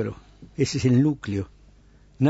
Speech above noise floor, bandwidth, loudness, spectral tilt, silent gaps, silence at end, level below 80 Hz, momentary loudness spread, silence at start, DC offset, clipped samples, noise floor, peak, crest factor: 30 dB; 8 kHz; -24 LUFS; -7 dB/octave; none; 0 s; -50 dBFS; 20 LU; 0 s; under 0.1%; under 0.1%; -53 dBFS; -10 dBFS; 16 dB